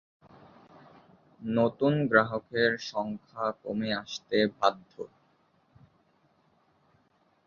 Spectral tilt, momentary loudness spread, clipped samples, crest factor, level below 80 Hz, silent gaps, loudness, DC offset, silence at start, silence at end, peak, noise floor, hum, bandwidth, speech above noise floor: -6 dB/octave; 17 LU; under 0.1%; 26 dB; -68 dBFS; none; -28 LUFS; under 0.1%; 1.4 s; 2.4 s; -6 dBFS; -68 dBFS; none; 7.2 kHz; 40 dB